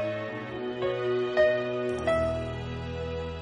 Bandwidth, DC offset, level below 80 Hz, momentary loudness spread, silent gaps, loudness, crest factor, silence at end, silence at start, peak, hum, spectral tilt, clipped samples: 10.5 kHz; under 0.1%; -46 dBFS; 10 LU; none; -29 LUFS; 16 dB; 0 s; 0 s; -12 dBFS; none; -6.5 dB/octave; under 0.1%